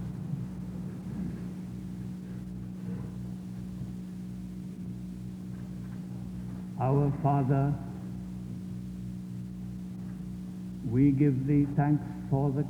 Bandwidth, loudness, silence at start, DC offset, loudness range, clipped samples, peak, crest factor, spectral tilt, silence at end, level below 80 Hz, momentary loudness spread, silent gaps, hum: 10.5 kHz; -33 LUFS; 0 s; under 0.1%; 10 LU; under 0.1%; -14 dBFS; 18 dB; -9.5 dB/octave; 0 s; -52 dBFS; 14 LU; none; 60 Hz at -55 dBFS